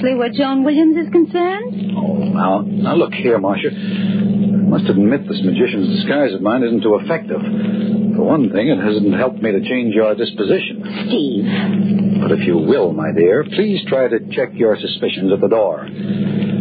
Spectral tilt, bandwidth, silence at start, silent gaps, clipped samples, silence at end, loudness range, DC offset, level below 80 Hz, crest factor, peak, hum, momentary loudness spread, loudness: -12 dB/octave; 5 kHz; 0 s; none; under 0.1%; 0 s; 1 LU; under 0.1%; -60 dBFS; 14 dB; -2 dBFS; none; 6 LU; -16 LUFS